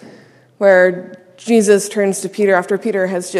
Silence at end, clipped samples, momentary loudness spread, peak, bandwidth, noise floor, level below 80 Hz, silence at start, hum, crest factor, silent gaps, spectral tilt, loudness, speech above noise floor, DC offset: 0 s; under 0.1%; 8 LU; 0 dBFS; 14 kHz; -45 dBFS; -70 dBFS; 0.05 s; none; 16 dB; none; -4.5 dB/octave; -14 LUFS; 31 dB; under 0.1%